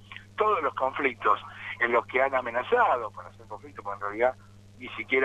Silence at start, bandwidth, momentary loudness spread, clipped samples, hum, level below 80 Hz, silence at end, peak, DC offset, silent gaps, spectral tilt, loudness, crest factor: 0.1 s; 10 kHz; 18 LU; under 0.1%; none; -62 dBFS; 0 s; -10 dBFS; under 0.1%; none; -5.5 dB/octave; -27 LUFS; 18 dB